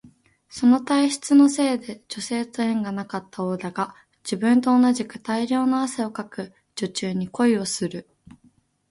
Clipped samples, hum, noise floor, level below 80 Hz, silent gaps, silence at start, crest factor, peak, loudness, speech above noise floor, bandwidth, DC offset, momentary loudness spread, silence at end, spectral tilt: under 0.1%; none; -60 dBFS; -66 dBFS; none; 0.5 s; 16 dB; -6 dBFS; -22 LUFS; 38 dB; 11.5 kHz; under 0.1%; 15 LU; 0.9 s; -4.5 dB/octave